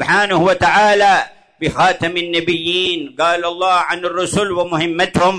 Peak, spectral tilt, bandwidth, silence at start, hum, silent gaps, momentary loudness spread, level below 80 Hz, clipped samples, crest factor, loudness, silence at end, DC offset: -2 dBFS; -4 dB/octave; 11 kHz; 0 s; none; none; 7 LU; -46 dBFS; under 0.1%; 12 dB; -15 LUFS; 0 s; under 0.1%